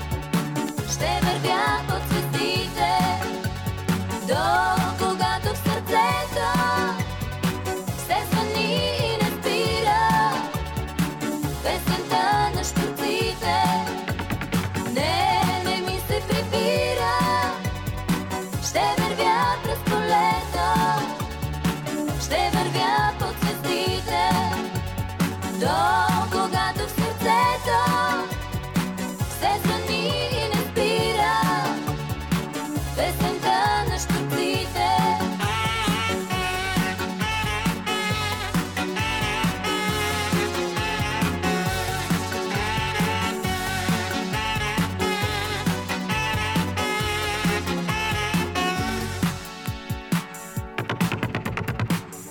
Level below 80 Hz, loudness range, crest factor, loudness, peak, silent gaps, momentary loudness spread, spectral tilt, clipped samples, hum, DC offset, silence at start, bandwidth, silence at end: -40 dBFS; 2 LU; 16 dB; -24 LUFS; -8 dBFS; none; 7 LU; -4.5 dB/octave; under 0.1%; none; under 0.1%; 0 s; 19.5 kHz; 0 s